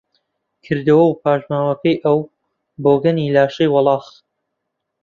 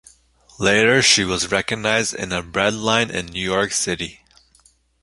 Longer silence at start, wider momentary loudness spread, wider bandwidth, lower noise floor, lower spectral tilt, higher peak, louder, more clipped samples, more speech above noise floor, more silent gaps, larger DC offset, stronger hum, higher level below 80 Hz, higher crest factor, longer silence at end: about the same, 0.7 s vs 0.6 s; second, 7 LU vs 10 LU; second, 7 kHz vs 11.5 kHz; first, -76 dBFS vs -57 dBFS; first, -8.5 dB/octave vs -2.5 dB/octave; about the same, -2 dBFS vs 0 dBFS; about the same, -16 LUFS vs -18 LUFS; neither; first, 61 dB vs 37 dB; neither; neither; neither; second, -58 dBFS vs -48 dBFS; about the same, 16 dB vs 20 dB; about the same, 1 s vs 0.9 s